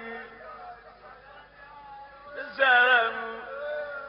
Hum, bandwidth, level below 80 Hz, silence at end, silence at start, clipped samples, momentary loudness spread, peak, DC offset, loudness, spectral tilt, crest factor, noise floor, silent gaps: none; 5.6 kHz; -66 dBFS; 0 s; 0 s; under 0.1%; 26 LU; -8 dBFS; under 0.1%; -23 LUFS; 2.5 dB/octave; 20 dB; -50 dBFS; none